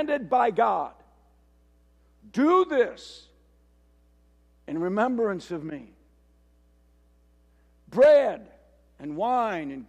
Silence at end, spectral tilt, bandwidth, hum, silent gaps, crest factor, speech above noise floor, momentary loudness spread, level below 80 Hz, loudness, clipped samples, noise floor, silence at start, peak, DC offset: 0.05 s; -6.5 dB/octave; 9 kHz; 60 Hz at -60 dBFS; none; 16 dB; 37 dB; 20 LU; -62 dBFS; -24 LUFS; under 0.1%; -61 dBFS; 0 s; -10 dBFS; under 0.1%